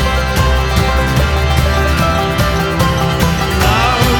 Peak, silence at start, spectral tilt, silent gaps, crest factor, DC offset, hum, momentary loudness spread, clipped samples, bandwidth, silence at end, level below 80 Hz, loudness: 0 dBFS; 0 s; -5 dB/octave; none; 12 dB; under 0.1%; none; 2 LU; under 0.1%; over 20 kHz; 0 s; -18 dBFS; -13 LUFS